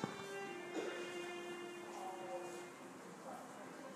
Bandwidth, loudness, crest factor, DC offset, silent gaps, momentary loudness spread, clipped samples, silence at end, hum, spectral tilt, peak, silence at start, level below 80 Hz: 15.5 kHz; -48 LUFS; 22 dB; under 0.1%; none; 8 LU; under 0.1%; 0 s; none; -4 dB/octave; -26 dBFS; 0 s; under -90 dBFS